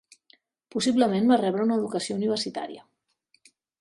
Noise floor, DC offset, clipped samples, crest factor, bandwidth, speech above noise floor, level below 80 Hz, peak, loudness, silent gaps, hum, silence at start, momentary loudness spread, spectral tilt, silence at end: -69 dBFS; under 0.1%; under 0.1%; 20 dB; 11.5 kHz; 45 dB; -70 dBFS; -8 dBFS; -25 LUFS; none; none; 0.75 s; 14 LU; -5 dB/octave; 1 s